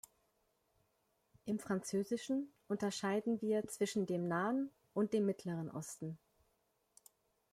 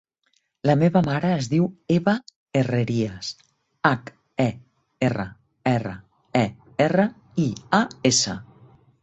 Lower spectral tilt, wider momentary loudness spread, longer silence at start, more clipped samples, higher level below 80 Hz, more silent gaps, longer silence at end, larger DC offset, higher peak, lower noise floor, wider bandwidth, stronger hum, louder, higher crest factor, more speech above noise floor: about the same, -5.5 dB/octave vs -5 dB/octave; second, 9 LU vs 12 LU; first, 1.45 s vs 0.65 s; neither; second, -78 dBFS vs -56 dBFS; second, none vs 2.36-2.46 s; first, 1.35 s vs 0.6 s; neither; second, -24 dBFS vs -4 dBFS; first, -80 dBFS vs -69 dBFS; first, 15.5 kHz vs 8.4 kHz; neither; second, -39 LUFS vs -23 LUFS; about the same, 16 dB vs 20 dB; second, 42 dB vs 48 dB